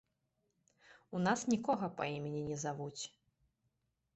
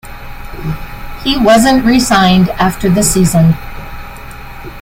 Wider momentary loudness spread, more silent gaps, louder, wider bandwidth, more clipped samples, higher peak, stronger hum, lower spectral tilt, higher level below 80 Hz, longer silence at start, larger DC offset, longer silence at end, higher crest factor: second, 11 LU vs 22 LU; neither; second, -38 LUFS vs -10 LUFS; second, 8.2 kHz vs 16.5 kHz; neither; second, -20 dBFS vs 0 dBFS; neither; about the same, -5 dB/octave vs -5 dB/octave; second, -74 dBFS vs -28 dBFS; first, 0.9 s vs 0.05 s; neither; first, 1.05 s vs 0 s; first, 20 dB vs 12 dB